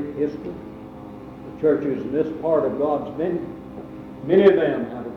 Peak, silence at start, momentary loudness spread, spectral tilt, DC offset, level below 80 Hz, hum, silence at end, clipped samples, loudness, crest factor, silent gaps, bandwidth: -4 dBFS; 0 s; 22 LU; -9 dB/octave; under 0.1%; -54 dBFS; none; 0 s; under 0.1%; -21 LUFS; 20 dB; none; 5.8 kHz